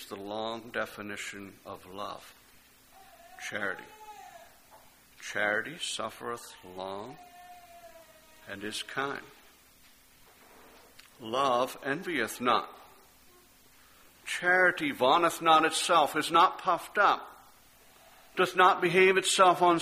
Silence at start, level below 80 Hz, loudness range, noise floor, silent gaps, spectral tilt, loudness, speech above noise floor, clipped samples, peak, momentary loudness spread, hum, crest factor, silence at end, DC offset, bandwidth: 0 s; -70 dBFS; 15 LU; -60 dBFS; none; -3 dB/octave; -27 LUFS; 31 dB; under 0.1%; -8 dBFS; 22 LU; none; 24 dB; 0 s; under 0.1%; 15.5 kHz